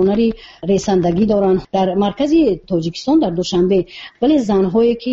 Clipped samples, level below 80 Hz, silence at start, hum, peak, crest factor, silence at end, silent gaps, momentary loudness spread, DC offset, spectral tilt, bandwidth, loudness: under 0.1%; -42 dBFS; 0 s; none; -4 dBFS; 12 dB; 0 s; none; 5 LU; under 0.1%; -6.5 dB/octave; 7.8 kHz; -16 LUFS